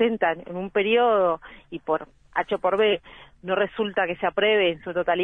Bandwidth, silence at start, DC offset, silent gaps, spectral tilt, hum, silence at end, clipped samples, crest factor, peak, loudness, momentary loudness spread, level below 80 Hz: 3.9 kHz; 0 s; under 0.1%; none; -7 dB/octave; none; 0 s; under 0.1%; 16 dB; -8 dBFS; -24 LUFS; 10 LU; -56 dBFS